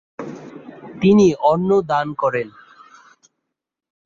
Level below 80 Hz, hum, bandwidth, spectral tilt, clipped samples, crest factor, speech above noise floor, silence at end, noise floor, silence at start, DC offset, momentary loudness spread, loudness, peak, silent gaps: -56 dBFS; none; 7.4 kHz; -7 dB/octave; under 0.1%; 16 dB; 65 dB; 1.55 s; -81 dBFS; 0.2 s; under 0.1%; 24 LU; -17 LUFS; -4 dBFS; none